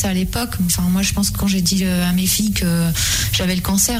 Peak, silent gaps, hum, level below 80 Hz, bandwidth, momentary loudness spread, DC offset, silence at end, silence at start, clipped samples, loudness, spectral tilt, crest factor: -4 dBFS; none; none; -30 dBFS; 16 kHz; 3 LU; under 0.1%; 0 s; 0 s; under 0.1%; -17 LUFS; -3.5 dB/octave; 14 dB